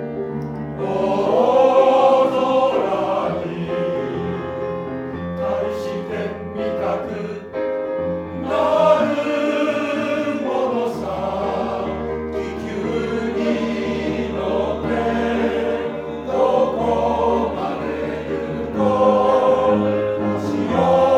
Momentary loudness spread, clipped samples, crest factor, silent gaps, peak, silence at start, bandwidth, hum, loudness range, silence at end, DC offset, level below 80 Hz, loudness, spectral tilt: 11 LU; under 0.1%; 16 dB; none; -2 dBFS; 0 s; 9 kHz; none; 7 LU; 0 s; under 0.1%; -44 dBFS; -20 LUFS; -7 dB/octave